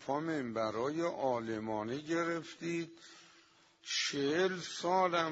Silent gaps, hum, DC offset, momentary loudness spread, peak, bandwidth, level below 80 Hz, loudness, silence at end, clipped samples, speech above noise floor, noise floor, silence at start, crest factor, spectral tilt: none; none; under 0.1%; 8 LU; -16 dBFS; 10 kHz; -78 dBFS; -35 LUFS; 0 s; under 0.1%; 30 dB; -65 dBFS; 0 s; 20 dB; -4 dB/octave